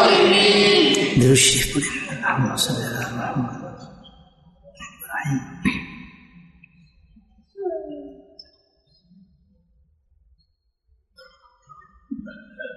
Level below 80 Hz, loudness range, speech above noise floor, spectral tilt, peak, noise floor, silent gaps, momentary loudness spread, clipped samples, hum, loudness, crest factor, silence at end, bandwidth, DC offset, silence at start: -50 dBFS; 20 LU; 45 dB; -3.5 dB/octave; -4 dBFS; -68 dBFS; none; 25 LU; under 0.1%; none; -19 LUFS; 20 dB; 0 s; 12.5 kHz; under 0.1%; 0 s